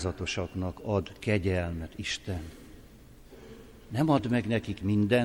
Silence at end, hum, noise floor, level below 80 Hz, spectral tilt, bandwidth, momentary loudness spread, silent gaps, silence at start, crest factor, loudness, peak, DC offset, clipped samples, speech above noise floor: 0 s; none; -52 dBFS; -50 dBFS; -6 dB/octave; 16.5 kHz; 23 LU; none; 0 s; 18 dB; -30 LUFS; -12 dBFS; under 0.1%; under 0.1%; 23 dB